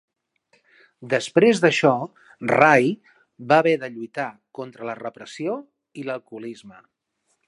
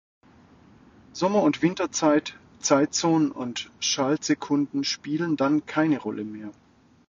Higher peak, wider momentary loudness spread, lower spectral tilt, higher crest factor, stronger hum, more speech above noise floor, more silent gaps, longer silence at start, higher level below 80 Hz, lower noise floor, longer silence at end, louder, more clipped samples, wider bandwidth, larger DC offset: first, 0 dBFS vs -8 dBFS; first, 20 LU vs 11 LU; first, -5.5 dB/octave vs -4 dB/octave; about the same, 22 dB vs 18 dB; neither; first, 51 dB vs 30 dB; neither; second, 1 s vs 1.15 s; second, -72 dBFS vs -66 dBFS; first, -72 dBFS vs -54 dBFS; first, 0.8 s vs 0.55 s; first, -21 LUFS vs -24 LUFS; neither; first, 11.5 kHz vs 7.8 kHz; neither